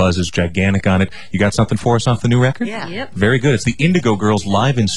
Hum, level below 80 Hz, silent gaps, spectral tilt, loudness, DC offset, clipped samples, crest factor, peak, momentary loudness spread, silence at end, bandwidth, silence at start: none; -40 dBFS; none; -6 dB/octave; -16 LUFS; 3%; under 0.1%; 12 dB; -2 dBFS; 5 LU; 0 s; 11.5 kHz; 0 s